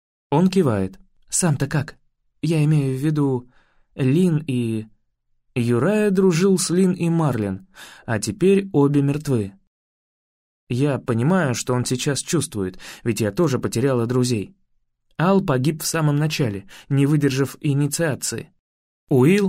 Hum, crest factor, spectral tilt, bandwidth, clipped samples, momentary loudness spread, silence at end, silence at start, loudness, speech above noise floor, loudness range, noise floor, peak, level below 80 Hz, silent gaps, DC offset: none; 16 dB; -6 dB/octave; 16 kHz; under 0.1%; 11 LU; 0 s; 0.3 s; -21 LUFS; 47 dB; 3 LU; -67 dBFS; -6 dBFS; -54 dBFS; 9.67-10.67 s, 18.59-19.07 s; under 0.1%